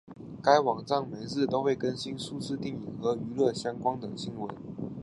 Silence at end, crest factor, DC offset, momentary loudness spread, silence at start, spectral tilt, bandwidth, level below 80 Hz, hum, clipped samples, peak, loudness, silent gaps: 0 s; 22 dB; under 0.1%; 13 LU; 0.05 s; -5.5 dB/octave; 11.5 kHz; -64 dBFS; none; under 0.1%; -8 dBFS; -30 LUFS; none